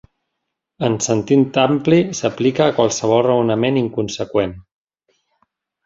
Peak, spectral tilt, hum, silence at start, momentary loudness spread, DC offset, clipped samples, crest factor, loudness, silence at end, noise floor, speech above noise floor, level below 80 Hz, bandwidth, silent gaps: -2 dBFS; -5.5 dB/octave; none; 0.8 s; 6 LU; under 0.1%; under 0.1%; 16 dB; -17 LUFS; 1.25 s; -78 dBFS; 61 dB; -52 dBFS; 7.8 kHz; none